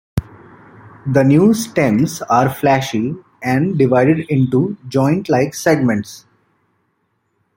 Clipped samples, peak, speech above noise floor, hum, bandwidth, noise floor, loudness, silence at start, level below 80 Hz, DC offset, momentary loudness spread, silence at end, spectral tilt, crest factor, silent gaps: under 0.1%; -2 dBFS; 52 dB; none; 16.5 kHz; -66 dBFS; -16 LUFS; 0.15 s; -48 dBFS; under 0.1%; 11 LU; 1.4 s; -6.5 dB/octave; 14 dB; none